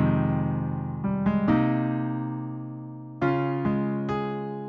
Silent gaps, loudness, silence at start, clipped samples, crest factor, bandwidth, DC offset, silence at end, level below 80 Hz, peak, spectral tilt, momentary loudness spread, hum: none; -27 LUFS; 0 s; under 0.1%; 16 dB; 5.4 kHz; under 0.1%; 0 s; -50 dBFS; -10 dBFS; -10.5 dB/octave; 12 LU; none